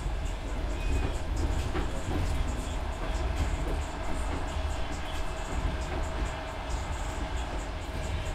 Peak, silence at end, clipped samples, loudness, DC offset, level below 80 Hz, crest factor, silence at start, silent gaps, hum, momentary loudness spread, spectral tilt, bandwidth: -18 dBFS; 0 s; under 0.1%; -34 LUFS; under 0.1%; -32 dBFS; 14 dB; 0 s; none; none; 4 LU; -5.5 dB/octave; 14.5 kHz